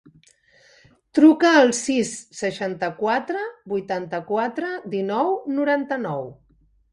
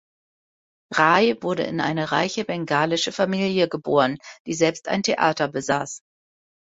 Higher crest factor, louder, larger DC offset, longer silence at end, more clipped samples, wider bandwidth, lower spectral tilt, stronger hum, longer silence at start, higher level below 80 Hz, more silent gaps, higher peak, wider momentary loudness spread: about the same, 20 dB vs 22 dB; about the same, -22 LUFS vs -22 LUFS; neither; about the same, 0.6 s vs 0.7 s; neither; first, 11.5 kHz vs 8 kHz; about the same, -4.5 dB/octave vs -4.5 dB/octave; neither; first, 1.15 s vs 0.9 s; about the same, -66 dBFS vs -64 dBFS; second, none vs 4.40-4.45 s; about the same, -2 dBFS vs -2 dBFS; first, 14 LU vs 8 LU